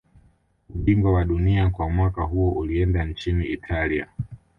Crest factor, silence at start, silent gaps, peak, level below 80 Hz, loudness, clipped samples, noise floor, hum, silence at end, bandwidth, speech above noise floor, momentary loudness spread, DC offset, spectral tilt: 16 dB; 0.7 s; none; -8 dBFS; -30 dBFS; -23 LUFS; under 0.1%; -60 dBFS; none; 0.25 s; 5.8 kHz; 38 dB; 7 LU; under 0.1%; -9 dB/octave